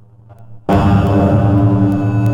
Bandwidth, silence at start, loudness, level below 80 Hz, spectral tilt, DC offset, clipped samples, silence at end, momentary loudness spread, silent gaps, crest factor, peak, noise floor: 7.6 kHz; 0.4 s; -13 LUFS; -32 dBFS; -9.5 dB/octave; under 0.1%; under 0.1%; 0 s; 4 LU; none; 10 dB; -2 dBFS; -40 dBFS